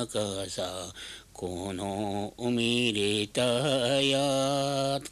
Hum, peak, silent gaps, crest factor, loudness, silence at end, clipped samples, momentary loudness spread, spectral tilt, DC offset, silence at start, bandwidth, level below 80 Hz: none; -14 dBFS; none; 16 dB; -28 LUFS; 0 s; under 0.1%; 13 LU; -4 dB/octave; under 0.1%; 0 s; 14.5 kHz; -58 dBFS